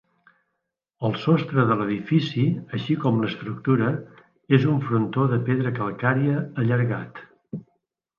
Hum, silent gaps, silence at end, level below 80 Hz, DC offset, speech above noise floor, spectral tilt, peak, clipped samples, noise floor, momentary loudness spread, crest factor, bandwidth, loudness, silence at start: none; none; 0.55 s; -64 dBFS; under 0.1%; 58 dB; -9 dB/octave; -4 dBFS; under 0.1%; -80 dBFS; 11 LU; 20 dB; 6.8 kHz; -23 LUFS; 1 s